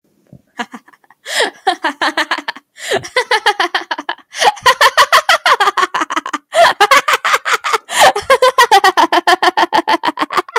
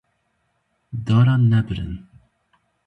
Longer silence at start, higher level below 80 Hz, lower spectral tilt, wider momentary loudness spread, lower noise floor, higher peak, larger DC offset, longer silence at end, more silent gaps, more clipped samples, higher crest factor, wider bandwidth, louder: second, 0.6 s vs 0.95 s; second, -58 dBFS vs -44 dBFS; second, -0.5 dB/octave vs -9 dB/octave; second, 11 LU vs 18 LU; second, -45 dBFS vs -70 dBFS; first, 0 dBFS vs -6 dBFS; neither; second, 0 s vs 0.9 s; neither; neither; about the same, 14 dB vs 16 dB; first, 19 kHz vs 4.7 kHz; first, -12 LUFS vs -19 LUFS